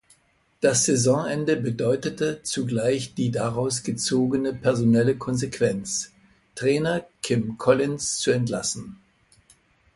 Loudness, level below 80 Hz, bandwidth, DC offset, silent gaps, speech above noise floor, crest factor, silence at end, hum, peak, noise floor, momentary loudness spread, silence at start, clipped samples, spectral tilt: -24 LUFS; -58 dBFS; 11.5 kHz; under 0.1%; none; 40 dB; 20 dB; 1 s; none; -6 dBFS; -63 dBFS; 8 LU; 0.6 s; under 0.1%; -4.5 dB/octave